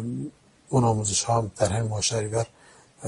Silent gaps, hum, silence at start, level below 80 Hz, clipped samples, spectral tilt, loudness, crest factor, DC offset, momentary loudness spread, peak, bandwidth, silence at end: none; none; 0 s; -52 dBFS; under 0.1%; -4.5 dB/octave; -25 LUFS; 18 dB; under 0.1%; 12 LU; -8 dBFS; 11 kHz; 0 s